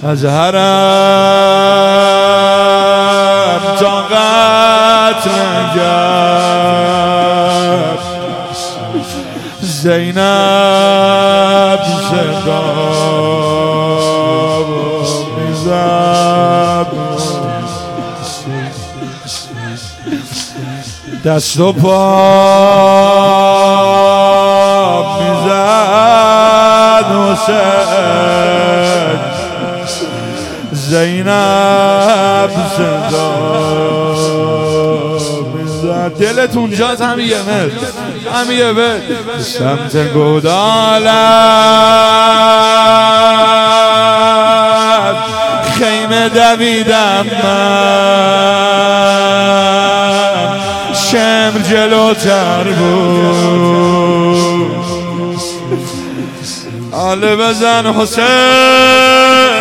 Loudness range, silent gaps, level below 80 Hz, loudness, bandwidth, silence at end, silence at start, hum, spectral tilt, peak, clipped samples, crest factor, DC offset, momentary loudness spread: 7 LU; none; -46 dBFS; -9 LUFS; 17 kHz; 0 s; 0 s; none; -4.5 dB/octave; 0 dBFS; under 0.1%; 10 dB; under 0.1%; 13 LU